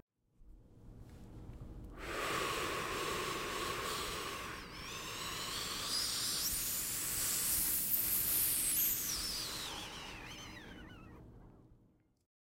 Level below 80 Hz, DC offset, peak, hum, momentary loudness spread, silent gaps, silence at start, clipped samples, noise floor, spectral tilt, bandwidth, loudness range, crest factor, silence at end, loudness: -58 dBFS; under 0.1%; -18 dBFS; none; 21 LU; none; 0.4 s; under 0.1%; -70 dBFS; -1 dB/octave; 16 kHz; 9 LU; 22 dB; 0.75 s; -35 LUFS